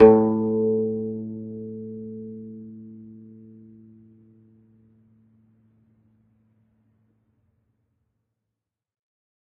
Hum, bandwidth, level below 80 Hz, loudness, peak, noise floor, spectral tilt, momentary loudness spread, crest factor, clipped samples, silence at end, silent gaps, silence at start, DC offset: none; 3.4 kHz; -60 dBFS; -24 LUFS; 0 dBFS; -85 dBFS; -9 dB/octave; 25 LU; 26 dB; under 0.1%; 6.3 s; none; 0 s; under 0.1%